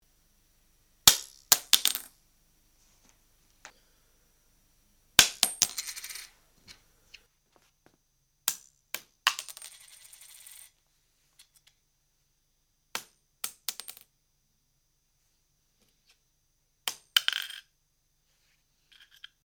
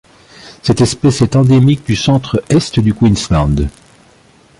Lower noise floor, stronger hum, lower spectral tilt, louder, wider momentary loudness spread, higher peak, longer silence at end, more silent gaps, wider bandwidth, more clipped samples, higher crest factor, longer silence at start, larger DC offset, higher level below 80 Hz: first, -73 dBFS vs -46 dBFS; first, 50 Hz at -75 dBFS vs none; second, 1.5 dB/octave vs -6.5 dB/octave; second, -26 LUFS vs -12 LUFS; first, 28 LU vs 7 LU; about the same, 0 dBFS vs -2 dBFS; first, 1.85 s vs 0.9 s; neither; first, over 20 kHz vs 11.5 kHz; neither; first, 34 dB vs 12 dB; first, 1.05 s vs 0.45 s; neither; second, -64 dBFS vs -28 dBFS